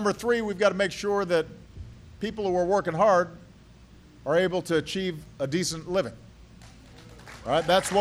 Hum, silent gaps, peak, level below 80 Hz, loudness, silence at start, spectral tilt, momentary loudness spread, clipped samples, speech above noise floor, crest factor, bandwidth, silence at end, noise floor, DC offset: none; none; -8 dBFS; -54 dBFS; -26 LUFS; 0 s; -4.5 dB/octave; 17 LU; under 0.1%; 26 dB; 18 dB; 15.5 kHz; 0 s; -51 dBFS; under 0.1%